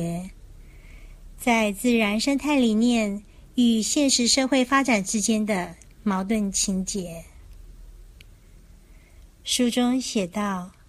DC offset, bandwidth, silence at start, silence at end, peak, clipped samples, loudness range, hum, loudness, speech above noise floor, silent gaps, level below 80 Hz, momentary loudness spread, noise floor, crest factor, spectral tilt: under 0.1%; 15.5 kHz; 0 s; 0.2 s; -4 dBFS; under 0.1%; 8 LU; none; -23 LUFS; 27 dB; none; -48 dBFS; 12 LU; -49 dBFS; 20 dB; -3.5 dB/octave